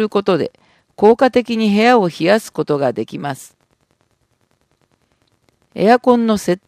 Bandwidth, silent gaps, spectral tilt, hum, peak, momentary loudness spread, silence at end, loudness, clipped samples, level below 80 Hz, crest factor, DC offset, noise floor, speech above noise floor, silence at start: 15 kHz; none; -6 dB/octave; none; 0 dBFS; 14 LU; 0.1 s; -15 LUFS; under 0.1%; -56 dBFS; 16 dB; under 0.1%; -63 dBFS; 48 dB; 0 s